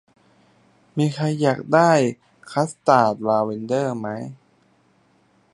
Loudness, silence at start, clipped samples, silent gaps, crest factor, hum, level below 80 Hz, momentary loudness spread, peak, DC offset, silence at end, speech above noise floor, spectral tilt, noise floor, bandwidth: -20 LUFS; 0.95 s; under 0.1%; none; 20 dB; none; -68 dBFS; 14 LU; -2 dBFS; under 0.1%; 1.2 s; 40 dB; -6.5 dB/octave; -60 dBFS; 11.5 kHz